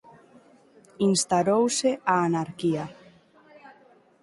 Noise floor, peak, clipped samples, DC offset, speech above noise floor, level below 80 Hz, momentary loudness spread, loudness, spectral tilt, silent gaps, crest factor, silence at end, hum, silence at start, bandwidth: -57 dBFS; -6 dBFS; under 0.1%; under 0.1%; 33 dB; -68 dBFS; 6 LU; -24 LUFS; -4.5 dB/octave; none; 20 dB; 0.5 s; none; 1 s; 11.5 kHz